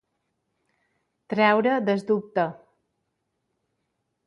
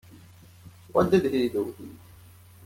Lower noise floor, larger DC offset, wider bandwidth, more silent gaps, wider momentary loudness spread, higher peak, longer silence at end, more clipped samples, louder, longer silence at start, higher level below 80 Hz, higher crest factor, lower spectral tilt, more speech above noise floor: first, -78 dBFS vs -51 dBFS; neither; second, 11 kHz vs 16.5 kHz; neither; second, 9 LU vs 20 LU; about the same, -6 dBFS vs -8 dBFS; first, 1.75 s vs 0.7 s; neither; about the same, -23 LUFS vs -25 LUFS; first, 1.3 s vs 0.15 s; second, -76 dBFS vs -60 dBFS; about the same, 20 dB vs 20 dB; about the same, -7 dB/octave vs -7 dB/octave; first, 55 dB vs 26 dB